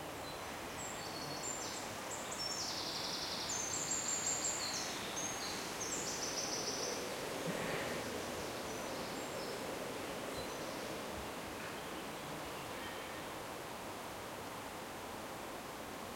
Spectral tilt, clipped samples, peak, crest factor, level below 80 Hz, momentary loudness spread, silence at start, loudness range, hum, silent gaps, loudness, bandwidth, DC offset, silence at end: -2 dB/octave; under 0.1%; -24 dBFS; 18 dB; -66 dBFS; 9 LU; 0 s; 7 LU; none; none; -41 LUFS; 16.5 kHz; under 0.1%; 0 s